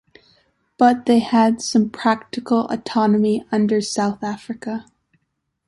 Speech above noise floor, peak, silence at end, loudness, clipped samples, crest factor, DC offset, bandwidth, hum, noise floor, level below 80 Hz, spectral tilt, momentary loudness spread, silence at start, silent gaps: 55 dB; -2 dBFS; 0.85 s; -19 LUFS; under 0.1%; 18 dB; under 0.1%; 11.5 kHz; none; -74 dBFS; -60 dBFS; -5 dB/octave; 12 LU; 0.8 s; none